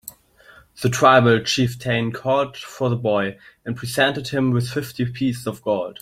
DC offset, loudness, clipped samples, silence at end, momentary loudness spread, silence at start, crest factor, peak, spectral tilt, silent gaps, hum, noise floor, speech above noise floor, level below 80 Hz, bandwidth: under 0.1%; -20 LUFS; under 0.1%; 0.1 s; 13 LU; 0.05 s; 20 dB; -2 dBFS; -5 dB/octave; none; none; -50 dBFS; 30 dB; -54 dBFS; 16 kHz